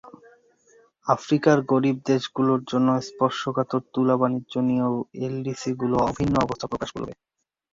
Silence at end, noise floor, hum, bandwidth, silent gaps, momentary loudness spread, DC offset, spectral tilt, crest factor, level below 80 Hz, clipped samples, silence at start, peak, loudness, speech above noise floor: 0.6 s; -59 dBFS; none; 7.6 kHz; none; 10 LU; under 0.1%; -6.5 dB/octave; 20 dB; -52 dBFS; under 0.1%; 0.05 s; -4 dBFS; -24 LUFS; 35 dB